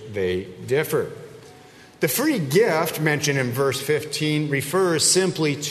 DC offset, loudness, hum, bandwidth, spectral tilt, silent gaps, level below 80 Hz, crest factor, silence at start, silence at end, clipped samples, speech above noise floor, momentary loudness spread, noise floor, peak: under 0.1%; -21 LUFS; none; 13.5 kHz; -4 dB/octave; none; -60 dBFS; 16 dB; 0 s; 0 s; under 0.1%; 25 dB; 8 LU; -47 dBFS; -6 dBFS